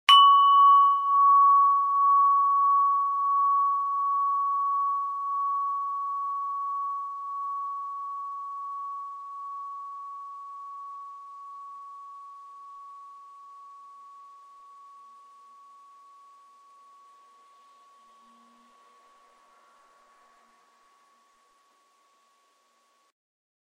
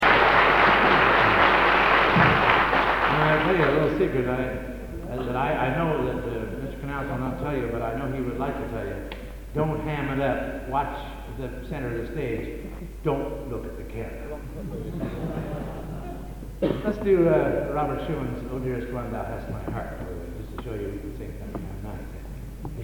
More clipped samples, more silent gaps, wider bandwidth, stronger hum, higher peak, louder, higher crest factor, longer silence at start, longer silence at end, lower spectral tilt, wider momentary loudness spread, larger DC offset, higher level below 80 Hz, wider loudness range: neither; neither; second, 12 kHz vs 19.5 kHz; neither; about the same, -4 dBFS vs -4 dBFS; about the same, -23 LUFS vs -24 LUFS; about the same, 24 dB vs 20 dB; about the same, 0.1 s vs 0 s; first, 9.75 s vs 0 s; second, 4.5 dB/octave vs -6.5 dB/octave; first, 26 LU vs 19 LU; neither; second, under -90 dBFS vs -38 dBFS; first, 26 LU vs 14 LU